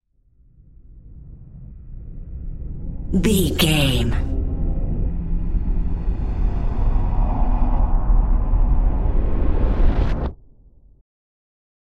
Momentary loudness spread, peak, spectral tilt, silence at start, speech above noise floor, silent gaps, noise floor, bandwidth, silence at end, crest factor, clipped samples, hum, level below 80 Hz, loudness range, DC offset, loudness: 20 LU; -4 dBFS; -5.5 dB/octave; 0.9 s; 38 dB; none; -55 dBFS; 14 kHz; 1.5 s; 16 dB; under 0.1%; none; -20 dBFS; 4 LU; under 0.1%; -23 LUFS